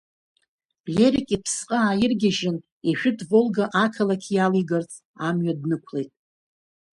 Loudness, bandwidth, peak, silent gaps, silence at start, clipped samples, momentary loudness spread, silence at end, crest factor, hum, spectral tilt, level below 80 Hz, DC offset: -23 LUFS; 11.5 kHz; -6 dBFS; 2.72-2.81 s, 5.05-5.14 s; 0.85 s; under 0.1%; 9 LU; 0.85 s; 18 dB; none; -5 dB/octave; -58 dBFS; under 0.1%